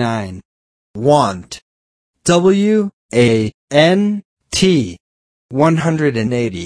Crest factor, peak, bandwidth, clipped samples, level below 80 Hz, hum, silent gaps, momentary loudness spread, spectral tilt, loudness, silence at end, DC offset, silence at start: 16 dB; 0 dBFS; 11 kHz; under 0.1%; -48 dBFS; none; 0.45-0.94 s, 1.62-2.14 s, 2.93-3.09 s, 3.54-3.68 s, 4.25-4.37 s, 5.00-5.49 s; 14 LU; -5.5 dB/octave; -15 LUFS; 0 s; under 0.1%; 0 s